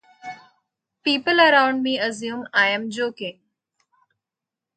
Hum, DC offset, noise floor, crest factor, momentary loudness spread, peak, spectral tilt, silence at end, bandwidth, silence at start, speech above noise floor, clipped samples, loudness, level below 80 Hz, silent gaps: none; under 0.1%; -87 dBFS; 20 dB; 20 LU; -2 dBFS; -3 dB/octave; 1.45 s; 9.2 kHz; 0.25 s; 67 dB; under 0.1%; -20 LUFS; -76 dBFS; none